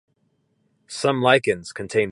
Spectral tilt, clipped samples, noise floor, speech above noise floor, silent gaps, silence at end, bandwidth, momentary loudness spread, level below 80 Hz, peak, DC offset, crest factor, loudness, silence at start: -4.5 dB/octave; under 0.1%; -68 dBFS; 47 dB; none; 0 s; 11 kHz; 10 LU; -60 dBFS; -2 dBFS; under 0.1%; 22 dB; -21 LUFS; 0.9 s